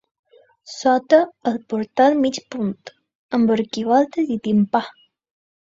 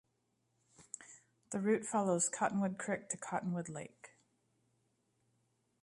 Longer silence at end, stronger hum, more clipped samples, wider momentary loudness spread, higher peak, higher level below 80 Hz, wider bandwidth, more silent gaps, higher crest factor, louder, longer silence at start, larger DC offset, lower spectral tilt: second, 0.9 s vs 1.75 s; neither; neither; second, 10 LU vs 17 LU; first, -2 dBFS vs -20 dBFS; first, -64 dBFS vs -80 dBFS; second, 7.8 kHz vs 11.5 kHz; first, 3.15-3.29 s vs none; about the same, 20 dB vs 22 dB; first, -19 LUFS vs -37 LUFS; second, 0.65 s vs 0.8 s; neither; about the same, -6 dB/octave vs -5 dB/octave